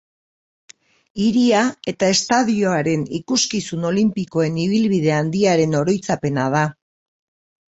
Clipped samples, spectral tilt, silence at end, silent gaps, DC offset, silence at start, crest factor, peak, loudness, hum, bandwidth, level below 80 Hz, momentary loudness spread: under 0.1%; -5 dB/octave; 1 s; none; under 0.1%; 1.15 s; 16 dB; -2 dBFS; -19 LUFS; none; 8.2 kHz; -56 dBFS; 5 LU